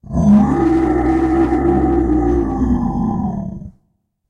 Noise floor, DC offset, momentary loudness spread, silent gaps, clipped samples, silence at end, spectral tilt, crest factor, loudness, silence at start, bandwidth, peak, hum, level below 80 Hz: -65 dBFS; under 0.1%; 10 LU; none; under 0.1%; 0.6 s; -9.5 dB/octave; 12 dB; -15 LUFS; 0.05 s; 8.6 kHz; -4 dBFS; none; -26 dBFS